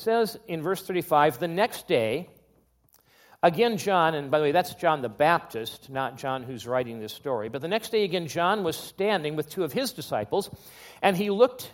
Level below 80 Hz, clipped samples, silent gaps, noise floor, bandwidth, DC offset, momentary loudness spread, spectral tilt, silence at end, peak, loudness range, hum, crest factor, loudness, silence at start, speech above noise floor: -68 dBFS; under 0.1%; none; -64 dBFS; 17 kHz; under 0.1%; 10 LU; -5 dB/octave; 0 s; -6 dBFS; 3 LU; none; 22 dB; -26 LUFS; 0 s; 38 dB